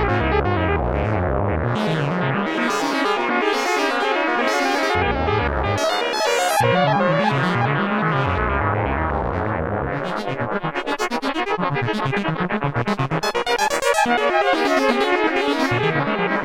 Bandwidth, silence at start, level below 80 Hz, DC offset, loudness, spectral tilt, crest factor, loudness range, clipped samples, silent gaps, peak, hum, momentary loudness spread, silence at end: 16.5 kHz; 0 s; -36 dBFS; under 0.1%; -20 LUFS; -5 dB/octave; 18 dB; 4 LU; under 0.1%; none; -2 dBFS; none; 5 LU; 0 s